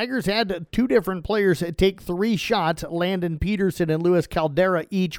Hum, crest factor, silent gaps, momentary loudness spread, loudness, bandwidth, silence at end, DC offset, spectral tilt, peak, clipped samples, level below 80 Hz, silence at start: none; 16 dB; none; 4 LU; -22 LUFS; 18 kHz; 0 s; under 0.1%; -6 dB/octave; -6 dBFS; under 0.1%; -40 dBFS; 0 s